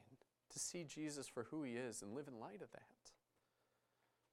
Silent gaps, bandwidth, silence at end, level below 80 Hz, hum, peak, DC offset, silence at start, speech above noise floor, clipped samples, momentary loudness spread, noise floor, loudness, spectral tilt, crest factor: none; 16 kHz; 1.2 s; -86 dBFS; none; -34 dBFS; under 0.1%; 0 s; 35 dB; under 0.1%; 17 LU; -85 dBFS; -50 LUFS; -3.5 dB/octave; 20 dB